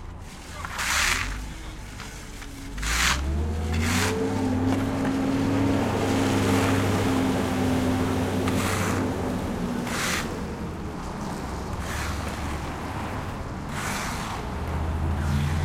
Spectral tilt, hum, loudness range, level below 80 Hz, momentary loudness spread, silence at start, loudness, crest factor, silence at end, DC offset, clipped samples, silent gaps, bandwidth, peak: -5 dB/octave; none; 7 LU; -38 dBFS; 13 LU; 0 s; -26 LUFS; 20 dB; 0 s; under 0.1%; under 0.1%; none; 16.5 kHz; -6 dBFS